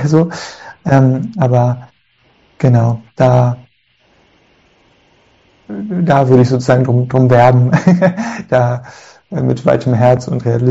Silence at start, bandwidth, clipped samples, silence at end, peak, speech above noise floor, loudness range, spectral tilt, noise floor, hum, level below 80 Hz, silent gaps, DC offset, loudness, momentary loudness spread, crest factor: 0 s; 7.8 kHz; 0.3%; 0 s; 0 dBFS; 44 dB; 6 LU; -8.5 dB/octave; -55 dBFS; none; -46 dBFS; none; under 0.1%; -12 LUFS; 15 LU; 12 dB